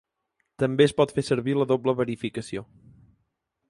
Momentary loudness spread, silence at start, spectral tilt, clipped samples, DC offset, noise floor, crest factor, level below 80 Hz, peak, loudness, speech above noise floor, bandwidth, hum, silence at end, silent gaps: 13 LU; 0.6 s; -6.5 dB/octave; under 0.1%; under 0.1%; -76 dBFS; 20 dB; -60 dBFS; -6 dBFS; -25 LUFS; 52 dB; 11.5 kHz; none; 1.05 s; none